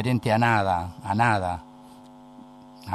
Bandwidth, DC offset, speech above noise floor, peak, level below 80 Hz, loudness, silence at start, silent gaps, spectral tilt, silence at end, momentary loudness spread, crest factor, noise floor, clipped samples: 13 kHz; under 0.1%; 24 dB; -8 dBFS; -54 dBFS; -23 LUFS; 0 s; none; -6.5 dB/octave; 0 s; 13 LU; 18 dB; -47 dBFS; under 0.1%